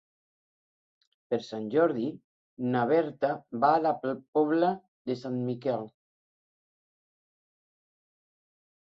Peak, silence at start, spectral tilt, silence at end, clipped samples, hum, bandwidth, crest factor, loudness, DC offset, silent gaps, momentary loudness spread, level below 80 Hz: -12 dBFS; 1.3 s; -8 dB/octave; 2.95 s; under 0.1%; none; 7.4 kHz; 20 dB; -29 LUFS; under 0.1%; 2.24-2.57 s, 4.28-4.33 s, 4.88-5.05 s; 10 LU; -76 dBFS